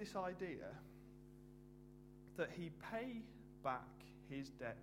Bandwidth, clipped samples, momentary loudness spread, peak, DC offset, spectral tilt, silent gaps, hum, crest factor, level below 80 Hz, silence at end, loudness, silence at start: 16 kHz; under 0.1%; 16 LU; -28 dBFS; under 0.1%; -6 dB/octave; none; none; 22 dB; -68 dBFS; 0 s; -49 LUFS; 0 s